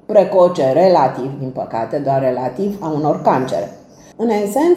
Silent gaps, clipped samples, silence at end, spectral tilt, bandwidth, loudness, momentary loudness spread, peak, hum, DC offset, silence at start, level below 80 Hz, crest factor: none; under 0.1%; 0 s; -7 dB/octave; 15.5 kHz; -16 LUFS; 12 LU; 0 dBFS; none; under 0.1%; 0.1 s; -56 dBFS; 14 dB